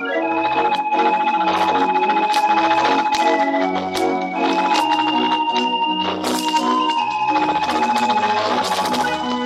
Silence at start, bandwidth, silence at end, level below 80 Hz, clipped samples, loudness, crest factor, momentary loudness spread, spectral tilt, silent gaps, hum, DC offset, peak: 0 s; 15 kHz; 0 s; -58 dBFS; under 0.1%; -18 LUFS; 14 dB; 4 LU; -3.5 dB/octave; none; none; under 0.1%; -4 dBFS